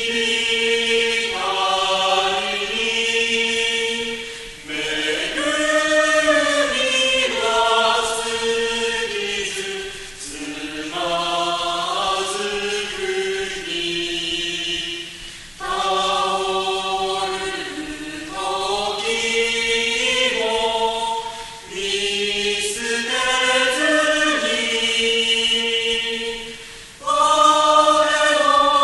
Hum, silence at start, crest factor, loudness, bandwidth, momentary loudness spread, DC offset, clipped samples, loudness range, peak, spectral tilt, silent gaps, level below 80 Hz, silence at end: none; 0 s; 18 dB; -19 LUFS; 12 kHz; 13 LU; under 0.1%; under 0.1%; 6 LU; -2 dBFS; -1 dB/octave; none; -48 dBFS; 0 s